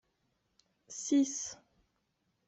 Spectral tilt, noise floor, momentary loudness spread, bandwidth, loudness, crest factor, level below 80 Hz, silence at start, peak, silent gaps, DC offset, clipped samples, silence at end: -2.5 dB/octave; -80 dBFS; 18 LU; 8.2 kHz; -33 LUFS; 18 dB; -80 dBFS; 0.9 s; -20 dBFS; none; under 0.1%; under 0.1%; 0.95 s